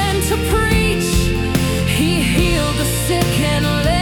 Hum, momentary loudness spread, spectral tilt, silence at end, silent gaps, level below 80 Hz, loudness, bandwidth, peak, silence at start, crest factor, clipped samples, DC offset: none; 2 LU; -4.5 dB/octave; 0 s; none; -24 dBFS; -16 LUFS; 18 kHz; -4 dBFS; 0 s; 12 dB; under 0.1%; under 0.1%